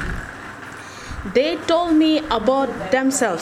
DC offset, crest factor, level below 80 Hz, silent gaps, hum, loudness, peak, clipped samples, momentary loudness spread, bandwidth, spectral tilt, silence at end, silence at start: under 0.1%; 16 dB; -38 dBFS; none; none; -19 LUFS; -4 dBFS; under 0.1%; 17 LU; 14 kHz; -4 dB/octave; 0 s; 0 s